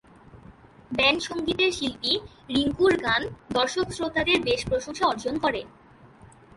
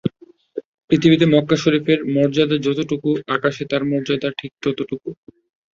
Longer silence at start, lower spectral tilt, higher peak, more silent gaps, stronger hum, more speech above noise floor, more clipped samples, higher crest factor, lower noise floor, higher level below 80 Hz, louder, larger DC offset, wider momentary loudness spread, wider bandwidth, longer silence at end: first, 0.35 s vs 0.05 s; second, -3.5 dB/octave vs -6.5 dB/octave; second, -8 dBFS vs -2 dBFS; second, none vs 0.65-0.78 s, 0.84-0.88 s; neither; about the same, 26 dB vs 27 dB; neither; about the same, 18 dB vs 18 dB; first, -51 dBFS vs -45 dBFS; first, -50 dBFS vs -56 dBFS; second, -25 LUFS vs -19 LUFS; neither; second, 7 LU vs 16 LU; first, 11.5 kHz vs 7.4 kHz; second, 0.3 s vs 0.6 s